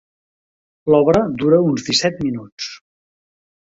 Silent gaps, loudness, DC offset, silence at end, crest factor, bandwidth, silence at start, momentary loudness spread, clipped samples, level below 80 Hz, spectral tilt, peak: 2.52-2.57 s; -16 LUFS; under 0.1%; 1 s; 18 dB; 8 kHz; 0.85 s; 15 LU; under 0.1%; -50 dBFS; -5 dB/octave; -2 dBFS